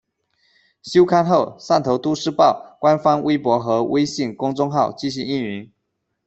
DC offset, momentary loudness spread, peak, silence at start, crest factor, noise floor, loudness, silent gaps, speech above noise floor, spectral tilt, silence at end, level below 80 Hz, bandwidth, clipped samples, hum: under 0.1%; 8 LU; -2 dBFS; 0.85 s; 16 dB; -75 dBFS; -19 LUFS; none; 56 dB; -6 dB/octave; 0.6 s; -60 dBFS; 8.2 kHz; under 0.1%; none